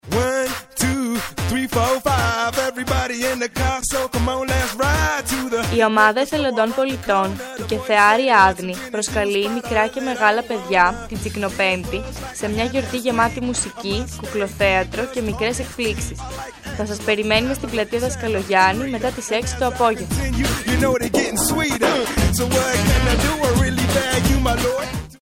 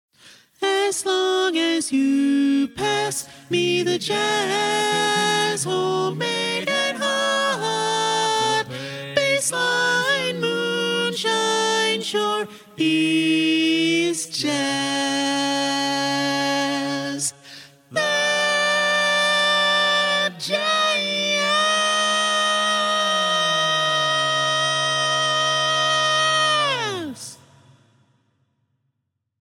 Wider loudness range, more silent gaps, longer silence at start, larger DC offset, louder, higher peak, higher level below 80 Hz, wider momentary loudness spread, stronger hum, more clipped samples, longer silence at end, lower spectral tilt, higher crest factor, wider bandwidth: about the same, 4 LU vs 3 LU; neither; second, 0.05 s vs 0.25 s; neither; about the same, -19 LUFS vs -20 LUFS; first, 0 dBFS vs -6 dBFS; first, -32 dBFS vs -68 dBFS; first, 9 LU vs 6 LU; neither; neither; second, 0.05 s vs 2.1 s; first, -4 dB/octave vs -2.5 dB/octave; about the same, 18 dB vs 16 dB; about the same, 17 kHz vs 17 kHz